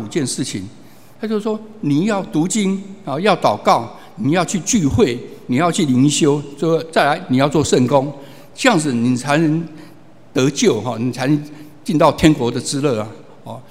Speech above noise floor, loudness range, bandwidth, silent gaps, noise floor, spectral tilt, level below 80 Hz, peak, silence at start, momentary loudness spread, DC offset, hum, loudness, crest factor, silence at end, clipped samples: 26 dB; 2 LU; 16 kHz; none; -42 dBFS; -5 dB/octave; -46 dBFS; 0 dBFS; 0 s; 14 LU; 0.8%; none; -17 LUFS; 18 dB; 0.1 s; under 0.1%